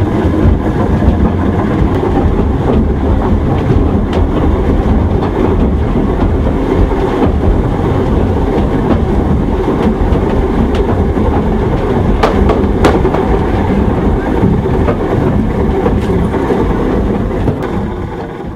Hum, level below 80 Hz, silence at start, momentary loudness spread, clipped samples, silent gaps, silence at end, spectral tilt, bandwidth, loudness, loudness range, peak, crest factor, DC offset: none; -16 dBFS; 0 s; 2 LU; under 0.1%; none; 0 s; -9 dB/octave; 10.5 kHz; -12 LUFS; 1 LU; 0 dBFS; 10 dB; under 0.1%